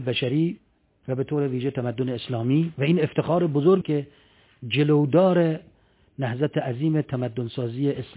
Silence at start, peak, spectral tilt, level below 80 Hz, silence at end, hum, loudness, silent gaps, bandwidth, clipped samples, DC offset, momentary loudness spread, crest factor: 0 s; -8 dBFS; -11.5 dB/octave; -60 dBFS; 0.05 s; none; -24 LUFS; none; 4 kHz; under 0.1%; under 0.1%; 11 LU; 16 dB